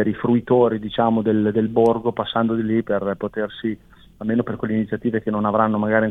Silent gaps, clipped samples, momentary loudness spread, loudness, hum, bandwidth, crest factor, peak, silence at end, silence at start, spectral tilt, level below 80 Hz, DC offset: none; under 0.1%; 8 LU; -21 LUFS; none; 4 kHz; 18 dB; -2 dBFS; 0 s; 0 s; -9 dB/octave; -52 dBFS; under 0.1%